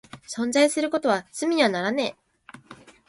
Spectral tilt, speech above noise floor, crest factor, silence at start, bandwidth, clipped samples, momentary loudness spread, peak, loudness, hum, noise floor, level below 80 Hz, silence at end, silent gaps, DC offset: -3.5 dB/octave; 27 dB; 20 dB; 0.15 s; 11.5 kHz; under 0.1%; 9 LU; -6 dBFS; -23 LUFS; none; -50 dBFS; -68 dBFS; 0.35 s; none; under 0.1%